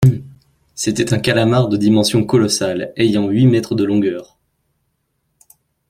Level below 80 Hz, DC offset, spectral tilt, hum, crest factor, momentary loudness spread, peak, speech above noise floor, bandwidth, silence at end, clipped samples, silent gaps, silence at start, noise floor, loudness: -48 dBFS; under 0.1%; -5.5 dB/octave; none; 16 dB; 8 LU; -2 dBFS; 53 dB; 16 kHz; 1.65 s; under 0.1%; none; 0 s; -68 dBFS; -15 LUFS